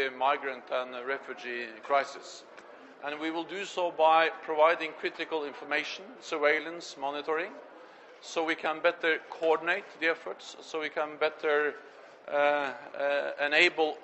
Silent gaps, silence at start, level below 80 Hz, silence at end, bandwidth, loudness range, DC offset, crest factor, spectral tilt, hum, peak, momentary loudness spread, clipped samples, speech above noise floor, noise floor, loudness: none; 0 s; -80 dBFS; 0 s; 8.4 kHz; 5 LU; under 0.1%; 22 dB; -2.5 dB/octave; none; -8 dBFS; 15 LU; under 0.1%; 21 dB; -52 dBFS; -30 LUFS